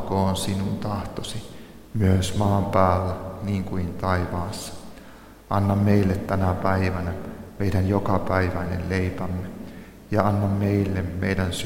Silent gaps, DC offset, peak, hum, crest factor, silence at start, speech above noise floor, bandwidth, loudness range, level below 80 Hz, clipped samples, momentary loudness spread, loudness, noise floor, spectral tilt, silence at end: none; under 0.1%; -2 dBFS; none; 20 dB; 0 s; 22 dB; 16 kHz; 2 LU; -44 dBFS; under 0.1%; 16 LU; -24 LUFS; -45 dBFS; -6.5 dB/octave; 0 s